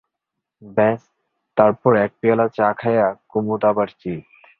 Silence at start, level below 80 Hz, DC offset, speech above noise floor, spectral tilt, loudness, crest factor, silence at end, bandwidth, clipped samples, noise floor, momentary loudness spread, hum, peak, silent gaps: 0.6 s; -58 dBFS; under 0.1%; 63 dB; -10 dB/octave; -19 LUFS; 18 dB; 0.4 s; 4.6 kHz; under 0.1%; -82 dBFS; 11 LU; none; 0 dBFS; none